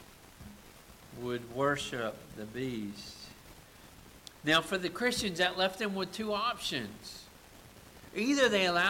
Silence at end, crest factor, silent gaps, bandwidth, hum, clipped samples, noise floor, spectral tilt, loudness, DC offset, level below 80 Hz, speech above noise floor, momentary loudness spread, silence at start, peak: 0 s; 18 dB; none; 17 kHz; none; under 0.1%; -55 dBFS; -3.5 dB/octave; -32 LUFS; under 0.1%; -62 dBFS; 22 dB; 25 LU; 0 s; -16 dBFS